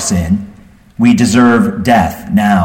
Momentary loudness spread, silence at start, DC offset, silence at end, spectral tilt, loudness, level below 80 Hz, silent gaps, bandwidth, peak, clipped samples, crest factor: 6 LU; 0 s; under 0.1%; 0 s; -5.5 dB/octave; -11 LUFS; -34 dBFS; none; 16.5 kHz; 0 dBFS; under 0.1%; 10 dB